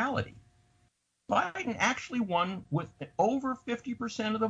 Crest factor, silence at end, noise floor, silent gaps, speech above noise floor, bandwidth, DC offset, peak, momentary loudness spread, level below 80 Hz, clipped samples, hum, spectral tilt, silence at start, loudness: 20 dB; 0 s; -72 dBFS; none; 41 dB; 9.8 kHz; under 0.1%; -12 dBFS; 7 LU; -64 dBFS; under 0.1%; none; -5 dB/octave; 0 s; -32 LUFS